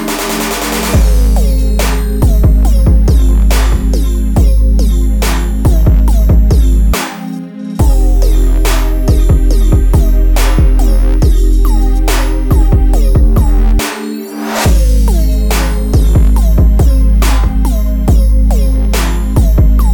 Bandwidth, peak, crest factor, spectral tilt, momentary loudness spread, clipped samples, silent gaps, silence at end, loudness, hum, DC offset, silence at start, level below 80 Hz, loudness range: 19.5 kHz; 0 dBFS; 8 dB; -6 dB/octave; 4 LU; under 0.1%; none; 0 s; -11 LUFS; none; under 0.1%; 0 s; -8 dBFS; 1 LU